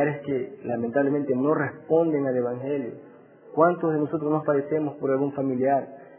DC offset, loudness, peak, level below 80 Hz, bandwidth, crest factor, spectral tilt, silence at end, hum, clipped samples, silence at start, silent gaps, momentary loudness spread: under 0.1%; -25 LUFS; -6 dBFS; -70 dBFS; 3.3 kHz; 18 dB; -12 dB/octave; 0.1 s; none; under 0.1%; 0 s; none; 8 LU